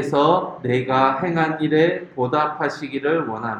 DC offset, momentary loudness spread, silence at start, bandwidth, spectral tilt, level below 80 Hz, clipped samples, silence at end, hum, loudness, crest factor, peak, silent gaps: under 0.1%; 7 LU; 0 s; 10.5 kHz; -7 dB/octave; -62 dBFS; under 0.1%; 0 s; none; -20 LUFS; 18 dB; -2 dBFS; none